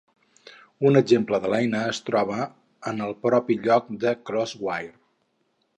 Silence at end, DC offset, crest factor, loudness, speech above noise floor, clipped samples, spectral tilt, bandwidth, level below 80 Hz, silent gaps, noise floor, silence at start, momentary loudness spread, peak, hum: 0.85 s; under 0.1%; 20 dB; -24 LUFS; 48 dB; under 0.1%; -6 dB/octave; 9.8 kHz; -68 dBFS; none; -71 dBFS; 0.8 s; 12 LU; -6 dBFS; none